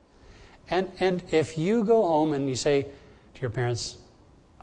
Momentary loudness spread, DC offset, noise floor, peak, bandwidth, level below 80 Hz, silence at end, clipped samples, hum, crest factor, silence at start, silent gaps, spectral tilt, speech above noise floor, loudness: 11 LU; under 0.1%; -56 dBFS; -12 dBFS; 10 kHz; -54 dBFS; 0.65 s; under 0.1%; none; 16 dB; 0.7 s; none; -5.5 dB/octave; 31 dB; -26 LUFS